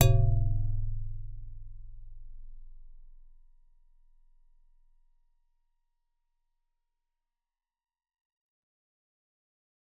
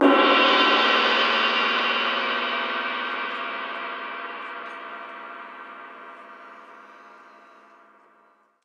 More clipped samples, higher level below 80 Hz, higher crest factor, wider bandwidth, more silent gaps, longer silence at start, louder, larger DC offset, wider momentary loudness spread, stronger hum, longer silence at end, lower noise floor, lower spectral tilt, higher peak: neither; first, -38 dBFS vs under -90 dBFS; first, 28 dB vs 20 dB; second, 3.9 kHz vs 8.8 kHz; neither; about the same, 0 s vs 0 s; second, -31 LUFS vs -21 LUFS; neither; first, 28 LU vs 24 LU; neither; first, 6.7 s vs 1.5 s; first, under -90 dBFS vs -60 dBFS; first, -8.5 dB/octave vs -2.5 dB/octave; about the same, -6 dBFS vs -6 dBFS